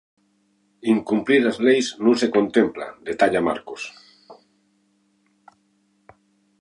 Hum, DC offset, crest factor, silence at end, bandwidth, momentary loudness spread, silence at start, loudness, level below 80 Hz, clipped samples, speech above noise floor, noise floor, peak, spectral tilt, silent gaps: none; under 0.1%; 20 dB; 2.25 s; 11 kHz; 14 LU; 0.85 s; -20 LUFS; -62 dBFS; under 0.1%; 45 dB; -65 dBFS; -4 dBFS; -5 dB/octave; none